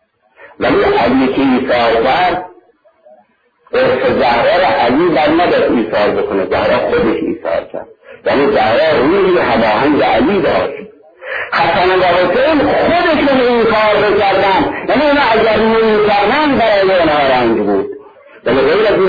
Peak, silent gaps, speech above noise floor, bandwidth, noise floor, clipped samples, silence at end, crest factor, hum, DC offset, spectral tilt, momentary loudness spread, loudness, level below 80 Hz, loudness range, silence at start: -2 dBFS; none; 41 dB; 5 kHz; -52 dBFS; under 0.1%; 0 s; 10 dB; none; under 0.1%; -7.5 dB/octave; 7 LU; -12 LUFS; -40 dBFS; 3 LU; 0.4 s